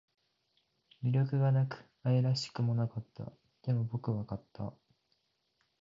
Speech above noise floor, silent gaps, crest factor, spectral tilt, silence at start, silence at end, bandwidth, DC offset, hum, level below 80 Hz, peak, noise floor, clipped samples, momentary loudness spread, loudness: 46 dB; none; 16 dB; -7.5 dB/octave; 1 s; 1.1 s; 7.6 kHz; under 0.1%; none; -66 dBFS; -18 dBFS; -78 dBFS; under 0.1%; 15 LU; -34 LUFS